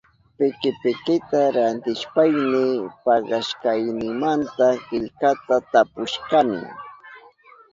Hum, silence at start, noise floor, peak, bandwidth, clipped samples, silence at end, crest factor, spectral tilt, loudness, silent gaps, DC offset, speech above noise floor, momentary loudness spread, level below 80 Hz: none; 0.4 s; -50 dBFS; -4 dBFS; 7.6 kHz; under 0.1%; 0.55 s; 18 dB; -5.5 dB/octave; -21 LUFS; none; under 0.1%; 29 dB; 7 LU; -62 dBFS